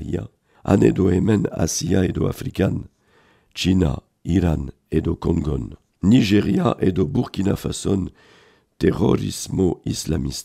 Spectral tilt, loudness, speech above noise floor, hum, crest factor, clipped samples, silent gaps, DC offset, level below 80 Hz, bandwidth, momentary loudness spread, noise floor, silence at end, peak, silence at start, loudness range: -6 dB/octave; -21 LUFS; 38 dB; none; 18 dB; under 0.1%; none; under 0.1%; -38 dBFS; 15.5 kHz; 12 LU; -57 dBFS; 0 s; -2 dBFS; 0 s; 3 LU